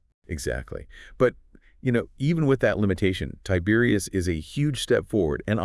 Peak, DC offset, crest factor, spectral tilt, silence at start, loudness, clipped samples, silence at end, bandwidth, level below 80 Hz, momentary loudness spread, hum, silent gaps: -6 dBFS; under 0.1%; 18 dB; -6 dB/octave; 0.3 s; -25 LUFS; under 0.1%; 0 s; 12 kHz; -44 dBFS; 10 LU; none; none